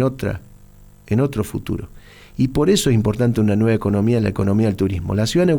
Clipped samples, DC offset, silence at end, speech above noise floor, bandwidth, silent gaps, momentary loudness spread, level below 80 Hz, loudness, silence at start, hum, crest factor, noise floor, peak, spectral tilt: under 0.1%; under 0.1%; 0 s; 27 dB; 19 kHz; none; 11 LU; -38 dBFS; -19 LUFS; 0 s; 50 Hz at -40 dBFS; 14 dB; -45 dBFS; -4 dBFS; -6.5 dB/octave